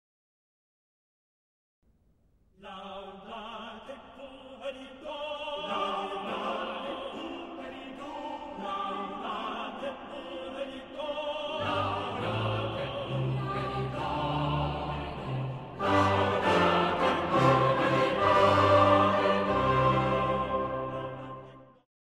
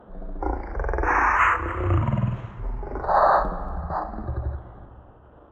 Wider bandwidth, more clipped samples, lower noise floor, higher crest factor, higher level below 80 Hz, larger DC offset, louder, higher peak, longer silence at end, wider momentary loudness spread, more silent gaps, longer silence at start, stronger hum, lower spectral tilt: first, 11.5 kHz vs 8.2 kHz; neither; first, -67 dBFS vs -50 dBFS; about the same, 20 dB vs 18 dB; second, -52 dBFS vs -32 dBFS; neither; second, -29 LUFS vs -24 LUFS; second, -10 dBFS vs -6 dBFS; first, 0.4 s vs 0.1 s; about the same, 18 LU vs 16 LU; neither; first, 2.6 s vs 0.1 s; neither; about the same, -6.5 dB/octave vs -7.5 dB/octave